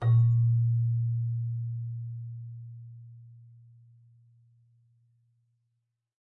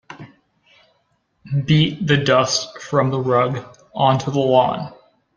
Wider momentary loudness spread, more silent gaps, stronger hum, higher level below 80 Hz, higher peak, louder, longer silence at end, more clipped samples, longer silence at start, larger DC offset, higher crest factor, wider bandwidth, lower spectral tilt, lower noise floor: first, 24 LU vs 15 LU; neither; neither; second, -64 dBFS vs -54 dBFS; second, -16 dBFS vs -2 dBFS; second, -29 LUFS vs -18 LUFS; first, 2.95 s vs 0.45 s; neither; about the same, 0 s vs 0.1 s; neither; about the same, 14 dB vs 18 dB; second, 2 kHz vs 10 kHz; first, -11.5 dB/octave vs -5.5 dB/octave; first, -81 dBFS vs -66 dBFS